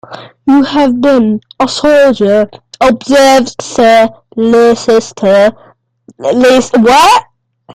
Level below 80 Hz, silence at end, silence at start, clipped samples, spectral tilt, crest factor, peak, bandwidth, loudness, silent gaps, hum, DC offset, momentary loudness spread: -42 dBFS; 0.55 s; 0.1 s; 0.1%; -4 dB/octave; 8 dB; 0 dBFS; 16 kHz; -8 LUFS; none; none; under 0.1%; 8 LU